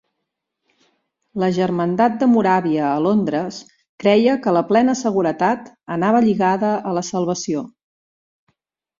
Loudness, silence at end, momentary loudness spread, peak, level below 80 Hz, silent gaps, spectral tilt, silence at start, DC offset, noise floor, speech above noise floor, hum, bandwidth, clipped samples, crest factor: -18 LUFS; 1.35 s; 10 LU; -2 dBFS; -62 dBFS; 3.89-3.98 s; -6 dB/octave; 1.35 s; under 0.1%; -78 dBFS; 61 dB; none; 7.6 kHz; under 0.1%; 16 dB